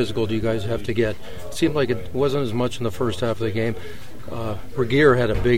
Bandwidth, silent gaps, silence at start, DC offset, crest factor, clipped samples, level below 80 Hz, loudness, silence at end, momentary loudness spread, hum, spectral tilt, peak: 16 kHz; none; 0 s; 4%; 18 dB; under 0.1%; -38 dBFS; -22 LUFS; 0 s; 16 LU; none; -6.5 dB/octave; -4 dBFS